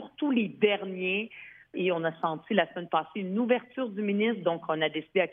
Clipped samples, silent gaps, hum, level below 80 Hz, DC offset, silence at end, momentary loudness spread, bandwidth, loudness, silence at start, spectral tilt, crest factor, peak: under 0.1%; none; none; -78 dBFS; under 0.1%; 0 s; 6 LU; 3.8 kHz; -29 LUFS; 0 s; -9 dB/octave; 18 dB; -10 dBFS